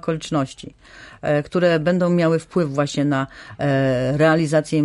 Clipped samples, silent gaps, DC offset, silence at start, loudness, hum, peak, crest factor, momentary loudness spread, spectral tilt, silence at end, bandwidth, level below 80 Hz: under 0.1%; none; under 0.1%; 0.05 s; -20 LUFS; none; -6 dBFS; 14 dB; 12 LU; -6.5 dB/octave; 0 s; 11.5 kHz; -52 dBFS